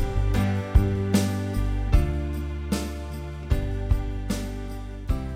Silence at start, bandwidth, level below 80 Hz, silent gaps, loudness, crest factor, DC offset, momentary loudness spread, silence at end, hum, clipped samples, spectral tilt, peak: 0 s; 15 kHz; -28 dBFS; none; -27 LUFS; 20 dB; under 0.1%; 11 LU; 0 s; none; under 0.1%; -6.5 dB/octave; -4 dBFS